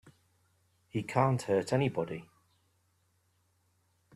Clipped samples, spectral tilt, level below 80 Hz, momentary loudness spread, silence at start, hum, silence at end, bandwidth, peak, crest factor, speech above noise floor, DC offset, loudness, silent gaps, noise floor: under 0.1%; -7 dB/octave; -70 dBFS; 11 LU; 0.05 s; none; 1.9 s; 13 kHz; -12 dBFS; 24 dB; 43 dB; under 0.1%; -32 LUFS; none; -73 dBFS